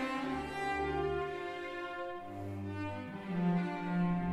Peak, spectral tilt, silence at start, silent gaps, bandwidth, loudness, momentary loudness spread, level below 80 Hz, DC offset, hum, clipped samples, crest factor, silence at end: -22 dBFS; -7.5 dB/octave; 0 s; none; 11 kHz; -37 LUFS; 9 LU; -56 dBFS; under 0.1%; none; under 0.1%; 14 dB; 0 s